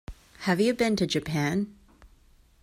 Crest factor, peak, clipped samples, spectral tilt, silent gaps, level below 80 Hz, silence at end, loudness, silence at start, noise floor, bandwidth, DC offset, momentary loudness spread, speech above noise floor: 18 dB; -12 dBFS; under 0.1%; -5.5 dB/octave; none; -52 dBFS; 0.55 s; -27 LUFS; 0.1 s; -58 dBFS; 16 kHz; under 0.1%; 11 LU; 33 dB